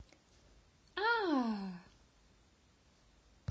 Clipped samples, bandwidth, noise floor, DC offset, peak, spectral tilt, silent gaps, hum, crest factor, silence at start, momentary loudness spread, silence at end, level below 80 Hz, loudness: under 0.1%; 8 kHz; -68 dBFS; under 0.1%; -20 dBFS; -6 dB/octave; none; none; 20 dB; 0 s; 16 LU; 1.7 s; -70 dBFS; -36 LUFS